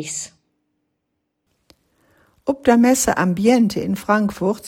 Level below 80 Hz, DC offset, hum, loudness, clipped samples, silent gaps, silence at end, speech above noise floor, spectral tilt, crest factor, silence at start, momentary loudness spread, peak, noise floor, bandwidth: -50 dBFS; under 0.1%; none; -18 LUFS; under 0.1%; none; 0 s; 57 dB; -5 dB/octave; 18 dB; 0 s; 14 LU; -2 dBFS; -75 dBFS; 17 kHz